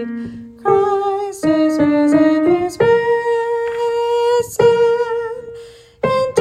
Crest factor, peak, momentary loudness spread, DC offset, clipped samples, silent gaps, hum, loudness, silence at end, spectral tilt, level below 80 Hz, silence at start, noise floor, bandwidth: 14 dB; 0 dBFS; 13 LU; under 0.1%; under 0.1%; none; none; -16 LUFS; 0 s; -6 dB/octave; -52 dBFS; 0 s; -38 dBFS; 13.5 kHz